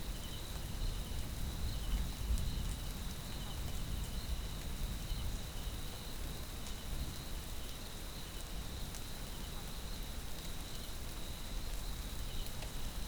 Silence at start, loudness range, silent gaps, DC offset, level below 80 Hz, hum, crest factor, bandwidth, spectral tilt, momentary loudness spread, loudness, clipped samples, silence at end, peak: 0 s; 3 LU; none; under 0.1%; -42 dBFS; none; 16 dB; over 20 kHz; -4 dB/octave; 5 LU; -44 LUFS; under 0.1%; 0 s; -24 dBFS